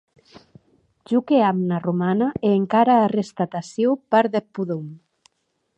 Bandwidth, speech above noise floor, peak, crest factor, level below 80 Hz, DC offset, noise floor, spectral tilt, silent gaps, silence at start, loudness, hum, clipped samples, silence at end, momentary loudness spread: 8.6 kHz; 53 dB; -4 dBFS; 18 dB; -62 dBFS; under 0.1%; -72 dBFS; -7.5 dB/octave; none; 0.35 s; -21 LUFS; none; under 0.1%; 0.8 s; 11 LU